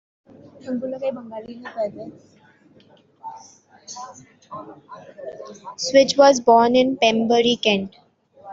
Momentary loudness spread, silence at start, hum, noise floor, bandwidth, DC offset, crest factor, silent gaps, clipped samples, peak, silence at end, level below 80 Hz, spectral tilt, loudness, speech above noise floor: 24 LU; 0.65 s; none; -54 dBFS; 7.8 kHz; under 0.1%; 20 dB; none; under 0.1%; -2 dBFS; 0 s; -64 dBFS; -3.5 dB/octave; -18 LUFS; 34 dB